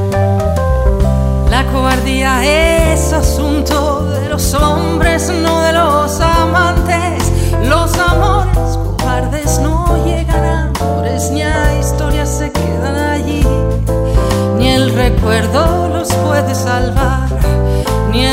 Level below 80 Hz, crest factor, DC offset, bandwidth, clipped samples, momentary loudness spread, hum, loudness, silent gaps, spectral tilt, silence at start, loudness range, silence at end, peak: -16 dBFS; 12 dB; under 0.1%; 16.5 kHz; under 0.1%; 4 LU; none; -13 LUFS; none; -5.5 dB/octave; 0 s; 2 LU; 0 s; 0 dBFS